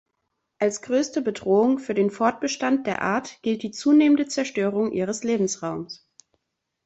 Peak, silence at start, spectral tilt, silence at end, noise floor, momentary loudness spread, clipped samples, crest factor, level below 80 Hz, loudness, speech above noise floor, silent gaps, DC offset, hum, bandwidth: -6 dBFS; 0.6 s; -5 dB/octave; 0.9 s; -79 dBFS; 8 LU; under 0.1%; 18 dB; -66 dBFS; -23 LUFS; 56 dB; none; under 0.1%; none; 8.2 kHz